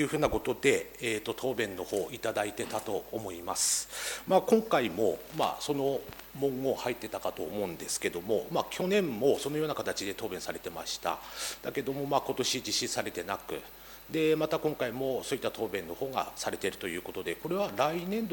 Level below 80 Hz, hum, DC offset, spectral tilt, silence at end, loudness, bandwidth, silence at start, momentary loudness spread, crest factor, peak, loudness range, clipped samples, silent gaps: -58 dBFS; none; under 0.1%; -3.5 dB/octave; 0 s; -32 LUFS; 19 kHz; 0 s; 9 LU; 22 dB; -10 dBFS; 4 LU; under 0.1%; none